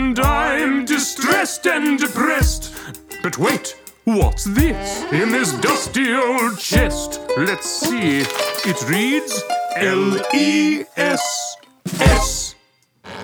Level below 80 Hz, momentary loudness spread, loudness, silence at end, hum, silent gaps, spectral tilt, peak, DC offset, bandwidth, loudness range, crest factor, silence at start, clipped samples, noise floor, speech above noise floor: -28 dBFS; 9 LU; -18 LUFS; 0 s; none; none; -4 dB/octave; 0 dBFS; under 0.1%; over 20 kHz; 1 LU; 18 dB; 0 s; under 0.1%; -57 dBFS; 39 dB